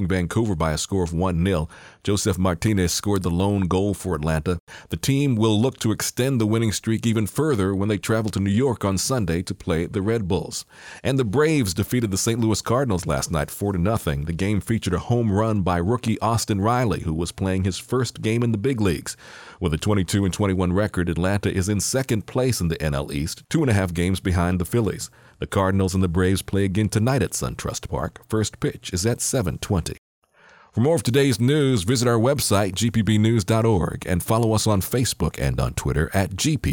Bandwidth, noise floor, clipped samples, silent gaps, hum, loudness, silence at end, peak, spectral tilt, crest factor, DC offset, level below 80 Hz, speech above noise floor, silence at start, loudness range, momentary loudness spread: 18.5 kHz; -53 dBFS; under 0.1%; 4.60-4.67 s, 29.98-30.22 s; none; -22 LUFS; 0 s; -6 dBFS; -5.5 dB/octave; 14 dB; under 0.1%; -42 dBFS; 31 dB; 0 s; 3 LU; 7 LU